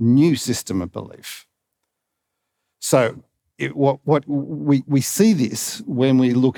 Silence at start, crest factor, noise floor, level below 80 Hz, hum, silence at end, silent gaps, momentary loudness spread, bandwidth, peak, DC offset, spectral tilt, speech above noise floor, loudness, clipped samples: 0 s; 18 dB; -79 dBFS; -66 dBFS; none; 0.05 s; none; 15 LU; over 20 kHz; -2 dBFS; under 0.1%; -5.5 dB/octave; 60 dB; -19 LUFS; under 0.1%